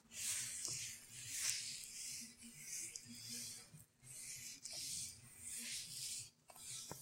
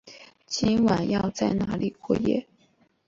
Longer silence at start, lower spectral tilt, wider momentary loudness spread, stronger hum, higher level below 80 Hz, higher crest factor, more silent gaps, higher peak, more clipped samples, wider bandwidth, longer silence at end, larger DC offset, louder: about the same, 0.05 s vs 0.05 s; second, 0 dB/octave vs -6 dB/octave; first, 13 LU vs 8 LU; neither; second, -80 dBFS vs -52 dBFS; first, 30 dB vs 16 dB; neither; second, -18 dBFS vs -10 dBFS; neither; first, 16.5 kHz vs 7.6 kHz; second, 0 s vs 0.65 s; neither; second, -46 LUFS vs -25 LUFS